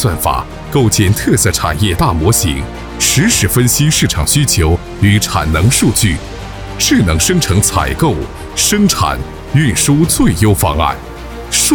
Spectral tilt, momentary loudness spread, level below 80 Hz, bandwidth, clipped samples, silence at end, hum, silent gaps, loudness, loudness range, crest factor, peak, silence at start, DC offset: -4 dB/octave; 10 LU; -24 dBFS; over 20 kHz; under 0.1%; 0 s; none; none; -12 LUFS; 2 LU; 12 dB; 0 dBFS; 0 s; under 0.1%